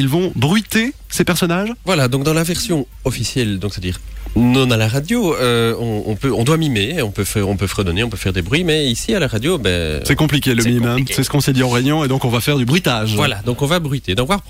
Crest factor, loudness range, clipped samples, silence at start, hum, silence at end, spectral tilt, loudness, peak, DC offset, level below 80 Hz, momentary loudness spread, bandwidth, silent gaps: 14 dB; 2 LU; under 0.1%; 0 s; none; 0 s; -5 dB/octave; -16 LUFS; -2 dBFS; under 0.1%; -34 dBFS; 5 LU; 16.5 kHz; none